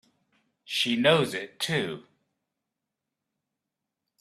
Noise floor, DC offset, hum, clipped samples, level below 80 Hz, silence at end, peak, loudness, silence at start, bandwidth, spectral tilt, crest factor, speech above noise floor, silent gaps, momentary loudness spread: -86 dBFS; under 0.1%; none; under 0.1%; -70 dBFS; 2.2 s; -6 dBFS; -26 LUFS; 0.7 s; 15 kHz; -4 dB/octave; 24 dB; 60 dB; none; 12 LU